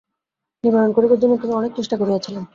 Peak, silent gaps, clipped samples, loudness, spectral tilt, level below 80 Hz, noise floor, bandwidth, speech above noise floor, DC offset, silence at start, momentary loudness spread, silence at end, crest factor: -4 dBFS; none; under 0.1%; -18 LUFS; -7 dB/octave; -62 dBFS; -83 dBFS; 7.4 kHz; 65 dB; under 0.1%; 0.65 s; 7 LU; 0.1 s; 16 dB